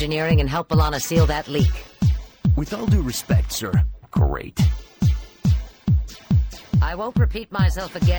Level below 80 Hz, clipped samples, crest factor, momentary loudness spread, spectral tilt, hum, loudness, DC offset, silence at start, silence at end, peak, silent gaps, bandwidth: -26 dBFS; under 0.1%; 14 dB; 4 LU; -6 dB/octave; none; -22 LUFS; under 0.1%; 0 s; 0 s; -6 dBFS; none; over 20 kHz